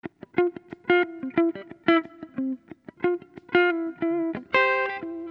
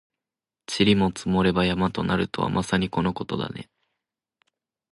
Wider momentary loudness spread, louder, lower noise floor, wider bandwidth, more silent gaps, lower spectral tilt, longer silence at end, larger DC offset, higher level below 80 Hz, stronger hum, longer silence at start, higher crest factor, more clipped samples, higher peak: about the same, 10 LU vs 12 LU; about the same, -25 LUFS vs -24 LUFS; second, -45 dBFS vs -89 dBFS; second, 5.6 kHz vs 11.5 kHz; neither; about the same, -7 dB/octave vs -6 dB/octave; second, 0 s vs 1.3 s; neither; second, -70 dBFS vs -48 dBFS; neither; second, 0.05 s vs 0.7 s; about the same, 20 dB vs 18 dB; neither; about the same, -6 dBFS vs -6 dBFS